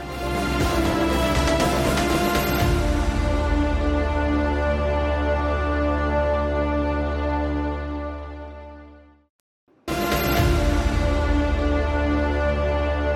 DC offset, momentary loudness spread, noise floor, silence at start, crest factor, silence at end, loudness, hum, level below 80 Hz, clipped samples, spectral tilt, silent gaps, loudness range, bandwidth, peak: under 0.1%; 7 LU; -47 dBFS; 0 s; 14 dB; 0 s; -22 LUFS; none; -26 dBFS; under 0.1%; -6 dB/octave; 9.30-9.67 s; 6 LU; 16 kHz; -8 dBFS